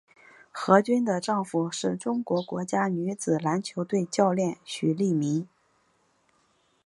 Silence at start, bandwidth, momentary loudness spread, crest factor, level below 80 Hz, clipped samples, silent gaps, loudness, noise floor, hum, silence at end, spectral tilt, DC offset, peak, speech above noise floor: 0.55 s; 11.5 kHz; 8 LU; 24 dB; -74 dBFS; under 0.1%; none; -27 LUFS; -68 dBFS; none; 1.4 s; -6 dB/octave; under 0.1%; -4 dBFS; 42 dB